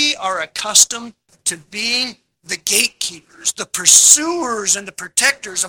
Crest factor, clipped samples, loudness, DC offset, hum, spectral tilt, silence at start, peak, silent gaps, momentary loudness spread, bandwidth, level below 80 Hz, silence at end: 18 dB; 0.2%; -14 LUFS; under 0.1%; none; 1 dB/octave; 0 s; 0 dBFS; none; 14 LU; over 20 kHz; -60 dBFS; 0 s